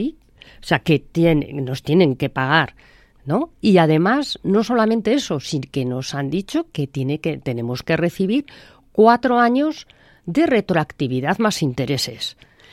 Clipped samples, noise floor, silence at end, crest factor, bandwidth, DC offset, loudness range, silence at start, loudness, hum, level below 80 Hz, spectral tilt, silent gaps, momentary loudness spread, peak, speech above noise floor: under 0.1%; -46 dBFS; 0.4 s; 18 dB; 14.5 kHz; under 0.1%; 4 LU; 0 s; -19 LUFS; none; -48 dBFS; -6 dB/octave; none; 10 LU; 0 dBFS; 28 dB